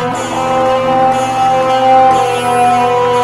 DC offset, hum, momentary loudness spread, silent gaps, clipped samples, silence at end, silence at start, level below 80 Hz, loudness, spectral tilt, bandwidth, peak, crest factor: under 0.1%; none; 5 LU; none; under 0.1%; 0 s; 0 s; -44 dBFS; -11 LUFS; -4.5 dB/octave; 14 kHz; 0 dBFS; 10 dB